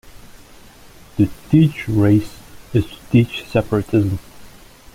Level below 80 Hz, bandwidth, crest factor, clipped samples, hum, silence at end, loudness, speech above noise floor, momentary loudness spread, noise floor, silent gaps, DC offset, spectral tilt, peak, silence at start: -42 dBFS; 16 kHz; 16 dB; under 0.1%; none; 0.45 s; -18 LUFS; 26 dB; 8 LU; -43 dBFS; none; under 0.1%; -8 dB/octave; -2 dBFS; 0.15 s